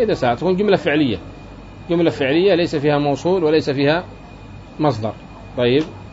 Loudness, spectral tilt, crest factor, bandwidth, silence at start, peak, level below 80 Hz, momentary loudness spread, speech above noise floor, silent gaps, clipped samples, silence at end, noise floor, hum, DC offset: -18 LUFS; -7 dB/octave; 16 dB; 7.8 kHz; 0 s; -2 dBFS; -44 dBFS; 21 LU; 20 dB; none; under 0.1%; 0.05 s; -37 dBFS; none; under 0.1%